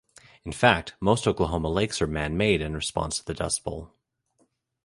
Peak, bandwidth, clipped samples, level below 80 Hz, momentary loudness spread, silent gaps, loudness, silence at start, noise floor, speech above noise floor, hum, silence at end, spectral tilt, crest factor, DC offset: -2 dBFS; 11.5 kHz; under 0.1%; -42 dBFS; 11 LU; none; -25 LUFS; 0.45 s; -70 dBFS; 44 dB; none; 1 s; -4.5 dB/octave; 26 dB; under 0.1%